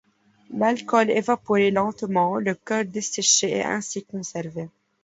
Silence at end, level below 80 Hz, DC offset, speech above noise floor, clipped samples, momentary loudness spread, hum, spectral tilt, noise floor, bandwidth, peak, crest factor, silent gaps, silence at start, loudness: 0.35 s; -66 dBFS; under 0.1%; 27 dB; under 0.1%; 13 LU; none; -3 dB/octave; -50 dBFS; 8 kHz; -4 dBFS; 20 dB; none; 0.5 s; -23 LUFS